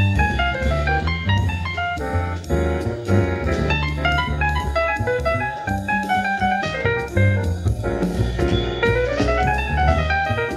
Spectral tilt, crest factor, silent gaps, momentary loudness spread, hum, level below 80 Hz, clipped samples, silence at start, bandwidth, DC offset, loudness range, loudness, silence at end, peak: -6.5 dB/octave; 16 dB; none; 4 LU; none; -28 dBFS; under 0.1%; 0 s; 13 kHz; under 0.1%; 1 LU; -21 LUFS; 0 s; -2 dBFS